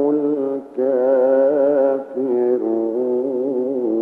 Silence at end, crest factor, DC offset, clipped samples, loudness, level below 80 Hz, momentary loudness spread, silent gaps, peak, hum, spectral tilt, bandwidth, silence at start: 0 s; 12 dB; under 0.1%; under 0.1%; -19 LUFS; -74 dBFS; 6 LU; none; -6 dBFS; none; -9.5 dB/octave; 3.2 kHz; 0 s